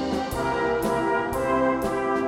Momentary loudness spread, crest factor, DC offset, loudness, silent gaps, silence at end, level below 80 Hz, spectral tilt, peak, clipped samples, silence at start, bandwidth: 3 LU; 12 dB; under 0.1%; -24 LUFS; none; 0 s; -44 dBFS; -5.5 dB/octave; -12 dBFS; under 0.1%; 0 s; 17.5 kHz